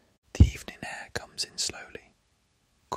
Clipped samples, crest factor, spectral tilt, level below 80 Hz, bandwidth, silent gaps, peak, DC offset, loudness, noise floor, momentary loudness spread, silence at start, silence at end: under 0.1%; 26 dB; -4.5 dB/octave; -34 dBFS; 15 kHz; none; -4 dBFS; under 0.1%; -29 LUFS; -70 dBFS; 21 LU; 0.35 s; 0 s